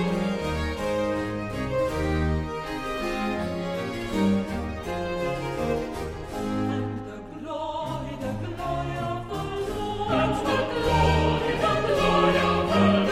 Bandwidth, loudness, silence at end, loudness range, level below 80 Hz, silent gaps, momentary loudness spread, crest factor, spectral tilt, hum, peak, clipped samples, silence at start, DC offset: 15.5 kHz; -26 LUFS; 0 s; 8 LU; -38 dBFS; none; 11 LU; 18 dB; -6 dB/octave; none; -8 dBFS; under 0.1%; 0 s; under 0.1%